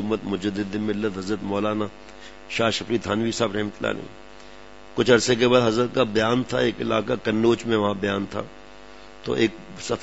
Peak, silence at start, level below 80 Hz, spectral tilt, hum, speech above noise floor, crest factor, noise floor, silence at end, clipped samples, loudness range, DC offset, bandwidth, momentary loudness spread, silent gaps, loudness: -4 dBFS; 0 s; -54 dBFS; -5 dB/octave; none; 22 dB; 20 dB; -45 dBFS; 0 s; under 0.1%; 5 LU; 0.5%; 8 kHz; 15 LU; none; -23 LUFS